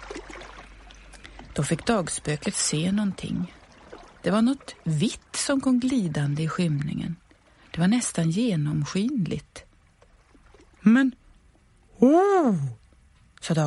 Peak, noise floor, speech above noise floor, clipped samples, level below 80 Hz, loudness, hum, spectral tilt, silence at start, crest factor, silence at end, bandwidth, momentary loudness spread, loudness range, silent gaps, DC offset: -6 dBFS; -58 dBFS; 34 dB; under 0.1%; -52 dBFS; -25 LUFS; none; -5.5 dB/octave; 0 s; 20 dB; 0 s; 11.5 kHz; 19 LU; 4 LU; none; under 0.1%